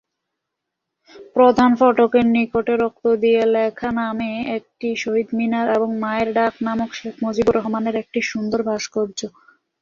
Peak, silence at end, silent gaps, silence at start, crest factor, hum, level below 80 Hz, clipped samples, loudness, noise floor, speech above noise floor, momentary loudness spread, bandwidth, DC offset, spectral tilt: -2 dBFS; 0.55 s; none; 1.15 s; 18 dB; none; -54 dBFS; under 0.1%; -19 LUFS; -80 dBFS; 62 dB; 11 LU; 7.4 kHz; under 0.1%; -5.5 dB/octave